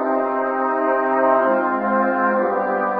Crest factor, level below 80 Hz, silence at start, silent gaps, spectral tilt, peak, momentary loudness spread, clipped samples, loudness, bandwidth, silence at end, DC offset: 14 dB; -82 dBFS; 0 s; none; -10 dB/octave; -6 dBFS; 4 LU; under 0.1%; -19 LUFS; 5.2 kHz; 0 s; 0.1%